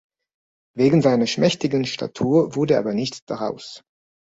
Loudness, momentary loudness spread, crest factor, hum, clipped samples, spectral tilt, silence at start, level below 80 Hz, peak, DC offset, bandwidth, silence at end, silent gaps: -20 LUFS; 12 LU; 16 dB; none; under 0.1%; -6 dB/octave; 0.75 s; -58 dBFS; -4 dBFS; under 0.1%; 8 kHz; 0.45 s; 3.22-3.27 s